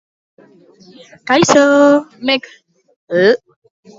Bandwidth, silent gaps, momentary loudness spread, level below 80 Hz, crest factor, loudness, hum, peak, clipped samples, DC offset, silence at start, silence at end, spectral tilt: 7.8 kHz; 2.96-3.08 s; 11 LU; -58 dBFS; 16 dB; -13 LUFS; none; 0 dBFS; under 0.1%; under 0.1%; 1.25 s; 0.6 s; -4 dB/octave